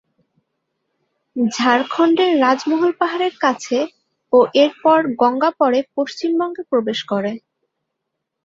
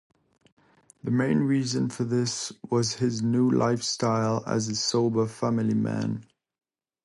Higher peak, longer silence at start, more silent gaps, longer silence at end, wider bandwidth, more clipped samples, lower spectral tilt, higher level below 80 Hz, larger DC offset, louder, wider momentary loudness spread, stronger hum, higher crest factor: first, -2 dBFS vs -10 dBFS; first, 1.35 s vs 1.05 s; neither; first, 1.1 s vs 0.8 s; second, 7.8 kHz vs 11.5 kHz; neither; about the same, -4.5 dB/octave vs -5.5 dB/octave; about the same, -66 dBFS vs -64 dBFS; neither; first, -17 LUFS vs -26 LUFS; about the same, 8 LU vs 6 LU; neither; about the same, 16 dB vs 16 dB